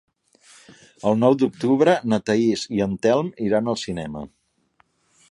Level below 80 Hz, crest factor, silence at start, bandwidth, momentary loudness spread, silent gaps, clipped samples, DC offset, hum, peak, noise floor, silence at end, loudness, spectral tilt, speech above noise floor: -56 dBFS; 20 dB; 1.05 s; 11.5 kHz; 12 LU; none; under 0.1%; under 0.1%; none; -4 dBFS; -64 dBFS; 1.05 s; -21 LUFS; -6 dB/octave; 43 dB